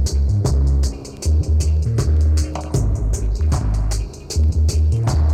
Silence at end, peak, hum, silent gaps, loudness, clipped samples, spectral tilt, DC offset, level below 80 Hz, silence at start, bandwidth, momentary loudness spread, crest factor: 0 s; -10 dBFS; none; none; -19 LUFS; under 0.1%; -6 dB/octave; under 0.1%; -18 dBFS; 0 s; 10.5 kHz; 5 LU; 6 dB